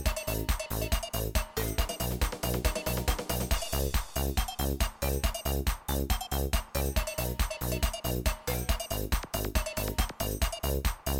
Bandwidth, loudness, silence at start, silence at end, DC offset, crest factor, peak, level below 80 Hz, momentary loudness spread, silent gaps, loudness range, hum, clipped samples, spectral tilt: 17 kHz; -32 LUFS; 0 s; 0 s; under 0.1%; 18 dB; -12 dBFS; -34 dBFS; 2 LU; none; 1 LU; none; under 0.1%; -4 dB/octave